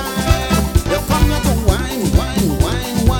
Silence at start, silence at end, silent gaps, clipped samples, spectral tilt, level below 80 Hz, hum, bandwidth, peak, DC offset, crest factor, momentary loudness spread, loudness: 0 s; 0 s; none; under 0.1%; -5.5 dB/octave; -20 dBFS; none; 18 kHz; 0 dBFS; under 0.1%; 16 dB; 2 LU; -16 LUFS